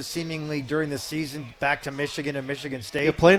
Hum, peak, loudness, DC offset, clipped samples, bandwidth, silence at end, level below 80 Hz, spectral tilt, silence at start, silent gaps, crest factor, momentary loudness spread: none; -4 dBFS; -28 LUFS; under 0.1%; under 0.1%; 16.5 kHz; 0 s; -50 dBFS; -5 dB/octave; 0 s; none; 22 dB; 6 LU